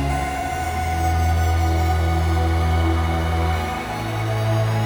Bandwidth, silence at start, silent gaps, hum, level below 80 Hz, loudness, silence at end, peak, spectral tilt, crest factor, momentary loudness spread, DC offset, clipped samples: over 20 kHz; 0 s; none; none; -26 dBFS; -21 LUFS; 0 s; -8 dBFS; -6 dB/octave; 12 dB; 5 LU; under 0.1%; under 0.1%